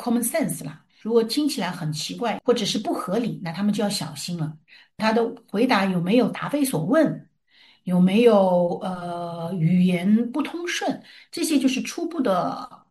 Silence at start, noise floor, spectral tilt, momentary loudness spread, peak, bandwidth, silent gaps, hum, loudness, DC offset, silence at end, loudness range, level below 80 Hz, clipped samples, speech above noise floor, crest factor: 0 s; -57 dBFS; -5.5 dB/octave; 11 LU; -4 dBFS; 12.5 kHz; none; none; -23 LUFS; under 0.1%; 0.15 s; 4 LU; -66 dBFS; under 0.1%; 34 dB; 18 dB